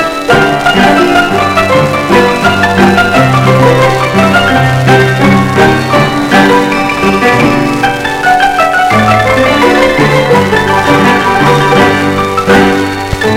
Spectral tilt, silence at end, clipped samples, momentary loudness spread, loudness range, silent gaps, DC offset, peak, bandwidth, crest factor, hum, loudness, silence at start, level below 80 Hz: -5.5 dB/octave; 0 s; 0.3%; 3 LU; 1 LU; none; under 0.1%; 0 dBFS; 16.5 kHz; 8 dB; none; -7 LUFS; 0 s; -30 dBFS